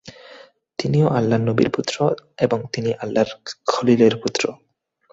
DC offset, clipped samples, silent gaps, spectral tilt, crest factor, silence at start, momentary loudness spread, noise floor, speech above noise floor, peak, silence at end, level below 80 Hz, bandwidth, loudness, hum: under 0.1%; under 0.1%; none; -6 dB/octave; 18 dB; 0.05 s; 10 LU; -46 dBFS; 27 dB; -2 dBFS; 0.6 s; -56 dBFS; 8 kHz; -20 LUFS; none